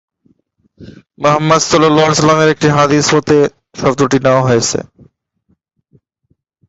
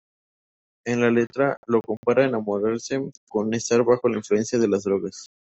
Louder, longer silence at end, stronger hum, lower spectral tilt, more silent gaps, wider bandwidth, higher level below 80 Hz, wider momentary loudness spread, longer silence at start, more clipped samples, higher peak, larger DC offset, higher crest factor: first, -11 LUFS vs -23 LUFS; first, 1.85 s vs 0.3 s; neither; about the same, -4.5 dB/octave vs -5.5 dB/octave; second, none vs 1.57-1.63 s, 1.97-2.03 s, 3.17-3.27 s; about the same, 8 kHz vs 8.2 kHz; first, -46 dBFS vs -64 dBFS; about the same, 7 LU vs 8 LU; about the same, 0.8 s vs 0.85 s; neither; first, 0 dBFS vs -6 dBFS; neither; about the same, 14 dB vs 18 dB